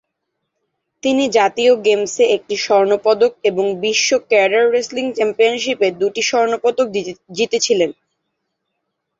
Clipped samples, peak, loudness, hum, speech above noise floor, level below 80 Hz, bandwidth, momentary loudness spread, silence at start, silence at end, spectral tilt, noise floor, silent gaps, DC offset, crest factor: under 0.1%; -2 dBFS; -16 LUFS; none; 59 dB; -64 dBFS; 7.8 kHz; 6 LU; 1.05 s; 1.25 s; -2.5 dB/octave; -75 dBFS; none; under 0.1%; 16 dB